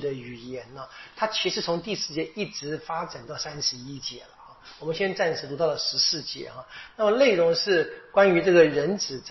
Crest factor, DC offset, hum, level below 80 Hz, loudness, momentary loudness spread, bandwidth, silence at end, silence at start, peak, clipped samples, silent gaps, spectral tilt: 20 dB; under 0.1%; none; -62 dBFS; -24 LUFS; 19 LU; 6.2 kHz; 0 s; 0 s; -6 dBFS; under 0.1%; none; -4 dB/octave